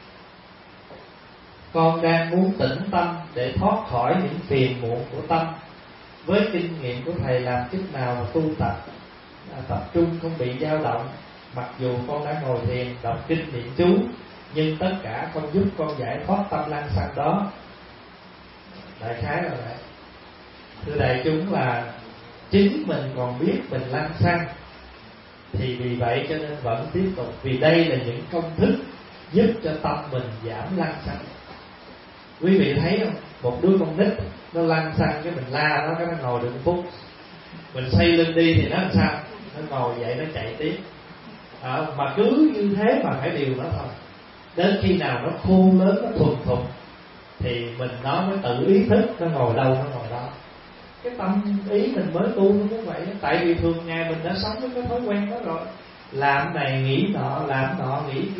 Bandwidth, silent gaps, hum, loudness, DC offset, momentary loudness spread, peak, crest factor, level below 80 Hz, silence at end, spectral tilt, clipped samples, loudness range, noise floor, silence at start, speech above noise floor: 5.8 kHz; none; none; -23 LUFS; under 0.1%; 22 LU; -6 dBFS; 18 dB; -48 dBFS; 0 s; -11.5 dB/octave; under 0.1%; 5 LU; -46 dBFS; 0 s; 24 dB